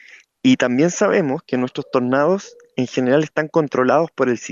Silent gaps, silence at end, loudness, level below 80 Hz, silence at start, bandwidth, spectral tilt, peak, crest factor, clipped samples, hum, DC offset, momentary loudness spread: none; 0 s; -18 LUFS; -66 dBFS; 0.45 s; 7.6 kHz; -5.5 dB/octave; -4 dBFS; 14 dB; under 0.1%; none; under 0.1%; 7 LU